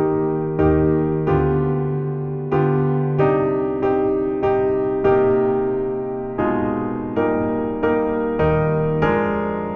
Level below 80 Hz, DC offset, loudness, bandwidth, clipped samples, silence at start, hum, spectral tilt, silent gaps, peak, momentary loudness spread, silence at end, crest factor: -40 dBFS; under 0.1%; -20 LUFS; 3.9 kHz; under 0.1%; 0 s; none; -11 dB/octave; none; -4 dBFS; 6 LU; 0 s; 14 dB